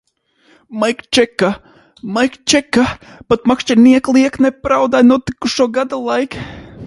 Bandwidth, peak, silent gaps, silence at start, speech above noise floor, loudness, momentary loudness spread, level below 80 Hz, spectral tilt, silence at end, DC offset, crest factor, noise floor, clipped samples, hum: 11.5 kHz; 0 dBFS; none; 0.7 s; 41 dB; -14 LUFS; 14 LU; -44 dBFS; -4 dB/octave; 0 s; under 0.1%; 14 dB; -55 dBFS; under 0.1%; none